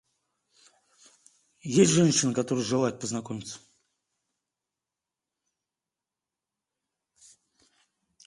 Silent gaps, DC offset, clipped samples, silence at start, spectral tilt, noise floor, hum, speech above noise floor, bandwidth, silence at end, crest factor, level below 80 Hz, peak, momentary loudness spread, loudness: none; under 0.1%; under 0.1%; 1.65 s; -4.5 dB/octave; -90 dBFS; none; 64 dB; 11.5 kHz; 4.7 s; 22 dB; -68 dBFS; -8 dBFS; 21 LU; -25 LUFS